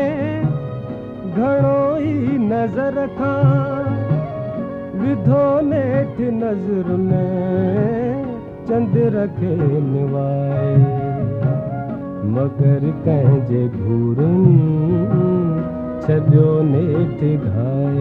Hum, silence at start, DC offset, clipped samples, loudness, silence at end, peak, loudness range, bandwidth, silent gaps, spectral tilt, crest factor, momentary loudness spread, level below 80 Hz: none; 0 s; under 0.1%; under 0.1%; -18 LUFS; 0 s; 0 dBFS; 3 LU; 4 kHz; none; -11.5 dB/octave; 16 dB; 10 LU; -44 dBFS